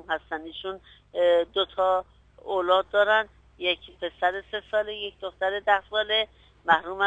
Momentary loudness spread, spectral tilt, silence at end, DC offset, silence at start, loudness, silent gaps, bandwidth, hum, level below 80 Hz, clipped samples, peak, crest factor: 14 LU; -4 dB/octave; 0 s; under 0.1%; 0.1 s; -26 LUFS; none; 9 kHz; 50 Hz at -65 dBFS; -58 dBFS; under 0.1%; -6 dBFS; 20 dB